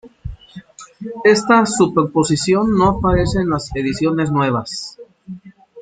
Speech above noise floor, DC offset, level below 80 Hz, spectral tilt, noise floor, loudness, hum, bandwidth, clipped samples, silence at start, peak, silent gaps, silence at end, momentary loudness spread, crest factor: 23 dB; under 0.1%; -36 dBFS; -5.5 dB/octave; -39 dBFS; -16 LUFS; none; 9.6 kHz; under 0.1%; 0.05 s; -2 dBFS; none; 0 s; 22 LU; 16 dB